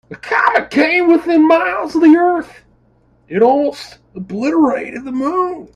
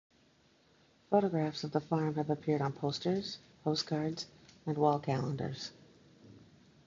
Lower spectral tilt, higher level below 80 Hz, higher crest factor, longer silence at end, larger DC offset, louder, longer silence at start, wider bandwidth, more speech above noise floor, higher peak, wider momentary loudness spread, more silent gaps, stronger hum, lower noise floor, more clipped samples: about the same, -6 dB/octave vs -6.5 dB/octave; first, -54 dBFS vs -70 dBFS; second, 14 dB vs 22 dB; second, 0.1 s vs 0.45 s; neither; first, -14 LUFS vs -34 LUFS; second, 0.1 s vs 1.1 s; first, 9.8 kHz vs 7.6 kHz; first, 40 dB vs 34 dB; first, 0 dBFS vs -14 dBFS; about the same, 14 LU vs 13 LU; neither; neither; second, -53 dBFS vs -68 dBFS; neither